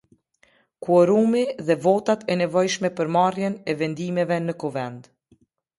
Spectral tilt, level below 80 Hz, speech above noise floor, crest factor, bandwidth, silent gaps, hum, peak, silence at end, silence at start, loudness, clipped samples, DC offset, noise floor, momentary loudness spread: -6 dB/octave; -68 dBFS; 40 dB; 18 dB; 11.5 kHz; none; none; -6 dBFS; 0.75 s; 0.8 s; -22 LUFS; under 0.1%; under 0.1%; -62 dBFS; 10 LU